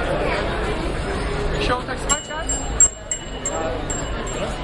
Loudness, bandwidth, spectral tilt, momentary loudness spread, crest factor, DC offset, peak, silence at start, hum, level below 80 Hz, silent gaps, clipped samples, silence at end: -22 LUFS; 11.5 kHz; -3 dB/octave; 11 LU; 18 dB; under 0.1%; -4 dBFS; 0 s; none; -30 dBFS; none; under 0.1%; 0 s